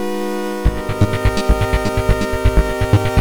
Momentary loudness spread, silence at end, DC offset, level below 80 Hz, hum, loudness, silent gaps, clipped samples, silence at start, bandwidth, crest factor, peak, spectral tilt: 4 LU; 0 s; under 0.1%; -20 dBFS; none; -18 LUFS; none; under 0.1%; 0 s; over 20 kHz; 14 dB; -2 dBFS; -6.5 dB/octave